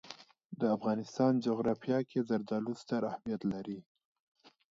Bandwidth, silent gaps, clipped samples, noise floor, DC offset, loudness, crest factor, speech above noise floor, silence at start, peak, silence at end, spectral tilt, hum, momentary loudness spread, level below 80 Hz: 7.8 kHz; 0.45-0.50 s; under 0.1%; -54 dBFS; under 0.1%; -34 LUFS; 18 dB; 21 dB; 0.05 s; -18 dBFS; 0.9 s; -7.5 dB/octave; none; 15 LU; -72 dBFS